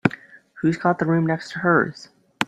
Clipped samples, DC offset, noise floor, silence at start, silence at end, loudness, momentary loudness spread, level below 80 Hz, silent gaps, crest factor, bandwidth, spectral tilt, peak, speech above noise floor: under 0.1%; under 0.1%; -42 dBFS; 0.05 s; 0 s; -22 LUFS; 7 LU; -60 dBFS; none; 22 dB; 10 kHz; -7 dB/octave; -2 dBFS; 22 dB